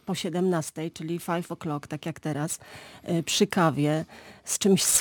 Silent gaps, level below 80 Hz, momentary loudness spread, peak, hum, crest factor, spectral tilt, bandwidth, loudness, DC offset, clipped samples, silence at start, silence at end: none; -64 dBFS; 13 LU; -10 dBFS; none; 18 dB; -4 dB/octave; 19 kHz; -27 LUFS; under 0.1%; under 0.1%; 0.05 s; 0 s